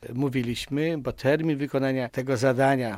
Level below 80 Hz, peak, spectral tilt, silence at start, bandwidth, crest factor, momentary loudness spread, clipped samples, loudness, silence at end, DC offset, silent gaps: -54 dBFS; -8 dBFS; -6.5 dB/octave; 0 s; 16 kHz; 18 dB; 6 LU; under 0.1%; -26 LUFS; 0 s; under 0.1%; none